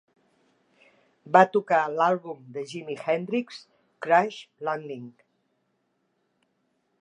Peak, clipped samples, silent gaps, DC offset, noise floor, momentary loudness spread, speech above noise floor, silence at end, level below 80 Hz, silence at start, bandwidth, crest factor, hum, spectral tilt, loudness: -2 dBFS; under 0.1%; none; under 0.1%; -74 dBFS; 20 LU; 49 dB; 1.9 s; -84 dBFS; 1.25 s; 10.5 kHz; 26 dB; none; -6 dB/octave; -25 LUFS